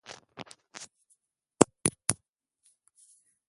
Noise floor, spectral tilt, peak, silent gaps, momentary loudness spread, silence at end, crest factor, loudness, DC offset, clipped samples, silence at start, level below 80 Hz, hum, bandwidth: -75 dBFS; -3.5 dB/octave; 0 dBFS; none; 22 LU; 1.35 s; 34 dB; -28 LUFS; under 0.1%; under 0.1%; 0.1 s; -62 dBFS; none; 11.5 kHz